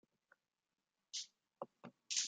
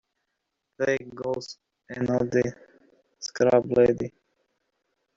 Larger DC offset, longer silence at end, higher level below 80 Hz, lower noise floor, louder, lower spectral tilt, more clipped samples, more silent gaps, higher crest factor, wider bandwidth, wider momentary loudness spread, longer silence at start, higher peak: neither; second, 0 s vs 1.1 s; second, under -90 dBFS vs -60 dBFS; first, under -90 dBFS vs -80 dBFS; second, -48 LUFS vs -25 LUFS; second, 1 dB/octave vs -6 dB/octave; neither; neither; first, 28 dB vs 20 dB; first, 11.5 kHz vs 7.6 kHz; second, 11 LU vs 17 LU; first, 1.15 s vs 0.8 s; second, -22 dBFS vs -6 dBFS